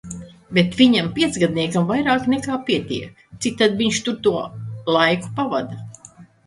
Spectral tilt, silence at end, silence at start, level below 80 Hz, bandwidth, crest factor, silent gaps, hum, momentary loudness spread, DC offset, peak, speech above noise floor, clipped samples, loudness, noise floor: -5 dB/octave; 0.2 s; 0.05 s; -52 dBFS; 11.5 kHz; 20 dB; none; none; 16 LU; under 0.1%; -2 dBFS; 27 dB; under 0.1%; -20 LUFS; -46 dBFS